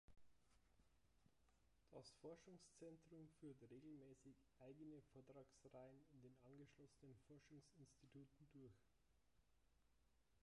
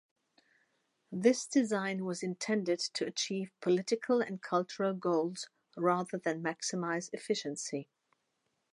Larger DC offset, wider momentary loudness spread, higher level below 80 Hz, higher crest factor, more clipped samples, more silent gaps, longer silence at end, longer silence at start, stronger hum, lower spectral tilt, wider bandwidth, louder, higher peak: neither; about the same, 6 LU vs 7 LU; about the same, -84 dBFS vs -86 dBFS; about the same, 18 dB vs 22 dB; neither; neither; second, 0 s vs 0.9 s; second, 0.05 s vs 1.1 s; neither; first, -6 dB/octave vs -4.5 dB/octave; about the same, 11 kHz vs 11.5 kHz; second, -66 LUFS vs -34 LUFS; second, -48 dBFS vs -14 dBFS